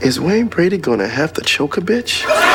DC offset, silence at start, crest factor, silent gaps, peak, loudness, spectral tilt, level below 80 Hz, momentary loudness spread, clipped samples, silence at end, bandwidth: under 0.1%; 0 s; 16 dB; none; 0 dBFS; -16 LUFS; -4 dB/octave; -48 dBFS; 3 LU; under 0.1%; 0 s; 19 kHz